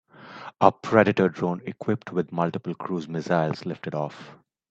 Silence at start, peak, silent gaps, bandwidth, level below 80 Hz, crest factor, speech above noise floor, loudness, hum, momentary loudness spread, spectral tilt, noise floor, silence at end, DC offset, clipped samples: 0.2 s; 0 dBFS; none; 7.8 kHz; -66 dBFS; 26 dB; 18 dB; -25 LUFS; none; 14 LU; -7.5 dB/octave; -43 dBFS; 0.35 s; under 0.1%; under 0.1%